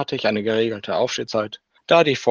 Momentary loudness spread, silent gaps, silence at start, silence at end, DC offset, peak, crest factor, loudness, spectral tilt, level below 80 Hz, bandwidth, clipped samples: 10 LU; none; 0 s; 0 s; under 0.1%; -2 dBFS; 20 dB; -20 LUFS; -4.5 dB/octave; -64 dBFS; 9.8 kHz; under 0.1%